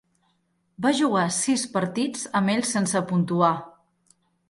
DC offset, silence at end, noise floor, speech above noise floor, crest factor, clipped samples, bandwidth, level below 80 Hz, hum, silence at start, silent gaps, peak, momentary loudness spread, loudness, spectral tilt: under 0.1%; 0.8 s; -70 dBFS; 46 dB; 18 dB; under 0.1%; 11.5 kHz; -68 dBFS; none; 0.8 s; none; -6 dBFS; 5 LU; -24 LUFS; -4.5 dB/octave